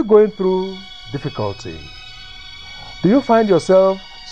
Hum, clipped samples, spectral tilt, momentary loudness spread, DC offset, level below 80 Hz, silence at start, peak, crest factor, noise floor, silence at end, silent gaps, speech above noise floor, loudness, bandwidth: none; under 0.1%; -6.5 dB/octave; 21 LU; 0.7%; -46 dBFS; 0 s; 0 dBFS; 16 dB; -36 dBFS; 0 s; none; 21 dB; -16 LUFS; 9.2 kHz